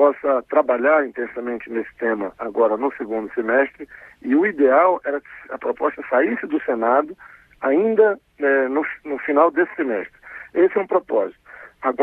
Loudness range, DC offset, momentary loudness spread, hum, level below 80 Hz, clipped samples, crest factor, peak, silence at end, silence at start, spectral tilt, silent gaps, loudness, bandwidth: 2 LU; under 0.1%; 12 LU; none; -62 dBFS; under 0.1%; 18 dB; -2 dBFS; 0 s; 0 s; -8.5 dB/octave; none; -20 LUFS; 3.9 kHz